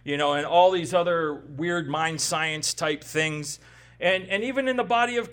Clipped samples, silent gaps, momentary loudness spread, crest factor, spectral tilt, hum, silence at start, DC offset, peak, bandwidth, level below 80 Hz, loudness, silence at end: under 0.1%; none; 9 LU; 18 dB; -3.5 dB/octave; none; 0.05 s; under 0.1%; -6 dBFS; 18 kHz; -60 dBFS; -24 LUFS; 0 s